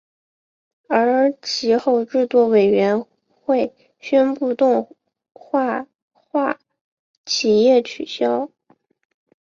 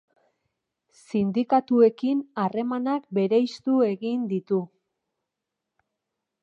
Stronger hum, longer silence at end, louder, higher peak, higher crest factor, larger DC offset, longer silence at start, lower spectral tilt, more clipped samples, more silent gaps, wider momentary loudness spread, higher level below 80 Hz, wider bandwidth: neither; second, 1 s vs 1.75 s; first, -19 LUFS vs -24 LUFS; first, -4 dBFS vs -8 dBFS; about the same, 16 dB vs 18 dB; neither; second, 0.9 s vs 1.15 s; second, -4.5 dB/octave vs -8 dB/octave; neither; first, 6.02-6.11 s, 6.81-7.24 s vs none; first, 13 LU vs 8 LU; first, -66 dBFS vs -72 dBFS; about the same, 7.4 kHz vs 8 kHz